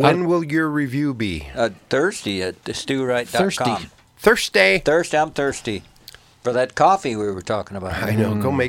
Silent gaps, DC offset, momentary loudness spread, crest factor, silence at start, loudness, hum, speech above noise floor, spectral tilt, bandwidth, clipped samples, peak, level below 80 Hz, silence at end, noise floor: none; under 0.1%; 11 LU; 20 dB; 0 s; -20 LUFS; none; 26 dB; -5 dB/octave; 17 kHz; under 0.1%; 0 dBFS; -46 dBFS; 0 s; -46 dBFS